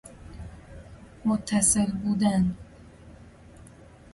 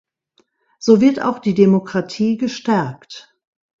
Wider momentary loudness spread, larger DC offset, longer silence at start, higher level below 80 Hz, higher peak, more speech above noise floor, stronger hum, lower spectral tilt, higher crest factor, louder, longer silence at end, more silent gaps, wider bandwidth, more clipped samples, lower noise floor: first, 25 LU vs 18 LU; neither; second, 0.05 s vs 0.8 s; first, -48 dBFS vs -60 dBFS; second, -10 dBFS vs 0 dBFS; second, 26 dB vs 46 dB; neither; second, -4.5 dB/octave vs -7 dB/octave; about the same, 20 dB vs 18 dB; second, -24 LUFS vs -17 LUFS; second, 0.3 s vs 0.6 s; neither; first, 11.5 kHz vs 7.6 kHz; neither; second, -50 dBFS vs -62 dBFS